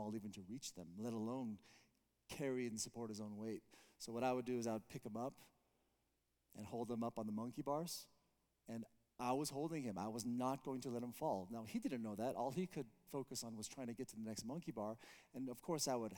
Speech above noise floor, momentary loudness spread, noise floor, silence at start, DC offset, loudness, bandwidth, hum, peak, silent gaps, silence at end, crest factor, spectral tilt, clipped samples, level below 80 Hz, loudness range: 39 dB; 11 LU; -85 dBFS; 0 s; under 0.1%; -46 LUFS; 19 kHz; none; -28 dBFS; none; 0 s; 18 dB; -5 dB/octave; under 0.1%; -80 dBFS; 4 LU